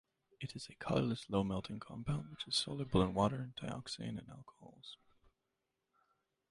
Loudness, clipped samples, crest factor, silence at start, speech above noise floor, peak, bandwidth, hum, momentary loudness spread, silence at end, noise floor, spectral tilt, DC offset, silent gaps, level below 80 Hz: -39 LUFS; under 0.1%; 22 dB; 0.4 s; 48 dB; -18 dBFS; 11.5 kHz; none; 20 LU; 1.55 s; -87 dBFS; -5.5 dB/octave; under 0.1%; none; -60 dBFS